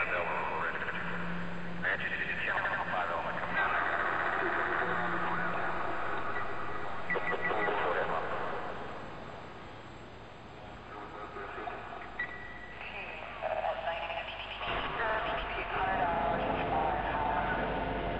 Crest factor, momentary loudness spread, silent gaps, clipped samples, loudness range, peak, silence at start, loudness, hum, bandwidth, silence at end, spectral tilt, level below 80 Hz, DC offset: 14 dB; 14 LU; none; under 0.1%; 11 LU; -20 dBFS; 0 s; -34 LUFS; none; 8.2 kHz; 0 s; -6 dB/octave; -52 dBFS; 0.5%